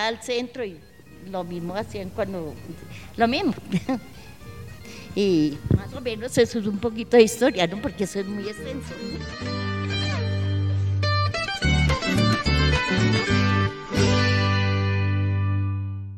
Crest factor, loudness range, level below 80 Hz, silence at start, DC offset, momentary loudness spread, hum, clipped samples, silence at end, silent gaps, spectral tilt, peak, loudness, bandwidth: 20 dB; 7 LU; -38 dBFS; 0 s; under 0.1%; 13 LU; none; under 0.1%; 0 s; none; -5.5 dB/octave; -2 dBFS; -24 LUFS; 14 kHz